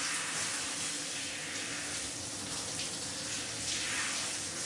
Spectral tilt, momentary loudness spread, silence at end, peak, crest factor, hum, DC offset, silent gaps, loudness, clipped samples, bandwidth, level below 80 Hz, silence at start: -0.5 dB/octave; 4 LU; 0 s; -22 dBFS; 14 dB; none; under 0.1%; none; -34 LUFS; under 0.1%; 11.5 kHz; -66 dBFS; 0 s